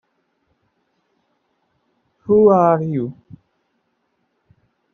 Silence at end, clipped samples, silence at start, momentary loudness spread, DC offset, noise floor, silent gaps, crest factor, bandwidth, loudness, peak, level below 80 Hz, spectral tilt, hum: 1.8 s; under 0.1%; 2.3 s; 17 LU; under 0.1%; -69 dBFS; none; 20 dB; 6.2 kHz; -16 LUFS; -2 dBFS; -60 dBFS; -10.5 dB/octave; none